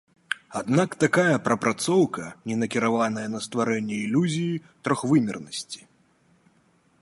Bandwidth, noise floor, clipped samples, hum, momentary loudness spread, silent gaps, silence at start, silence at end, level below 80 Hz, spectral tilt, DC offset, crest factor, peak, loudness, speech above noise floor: 11.5 kHz; -63 dBFS; under 0.1%; none; 12 LU; none; 0.3 s; 1.25 s; -66 dBFS; -5.5 dB/octave; under 0.1%; 20 dB; -4 dBFS; -25 LUFS; 39 dB